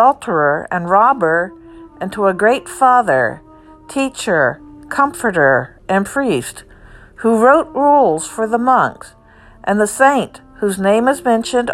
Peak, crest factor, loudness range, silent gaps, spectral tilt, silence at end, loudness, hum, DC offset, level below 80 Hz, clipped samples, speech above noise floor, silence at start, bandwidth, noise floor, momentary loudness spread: 0 dBFS; 14 dB; 2 LU; none; -5 dB/octave; 0 s; -15 LUFS; none; under 0.1%; -48 dBFS; under 0.1%; 28 dB; 0 s; 14.5 kHz; -42 dBFS; 10 LU